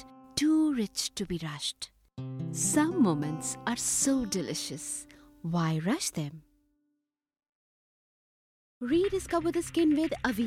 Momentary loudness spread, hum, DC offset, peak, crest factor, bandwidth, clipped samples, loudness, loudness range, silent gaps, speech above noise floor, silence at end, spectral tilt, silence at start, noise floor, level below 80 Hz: 12 LU; none; under 0.1%; -14 dBFS; 18 dB; 16 kHz; under 0.1%; -30 LUFS; 7 LU; 7.49-8.81 s; 54 dB; 0 s; -4 dB/octave; 0 s; -83 dBFS; -58 dBFS